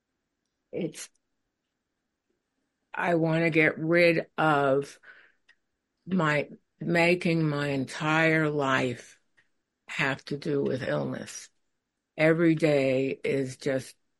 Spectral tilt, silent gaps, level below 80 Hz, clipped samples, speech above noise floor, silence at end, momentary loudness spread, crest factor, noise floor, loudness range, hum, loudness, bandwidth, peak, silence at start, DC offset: -6 dB/octave; none; -68 dBFS; under 0.1%; 56 dB; 0.3 s; 15 LU; 20 dB; -82 dBFS; 5 LU; none; -26 LUFS; 11.5 kHz; -8 dBFS; 0.75 s; under 0.1%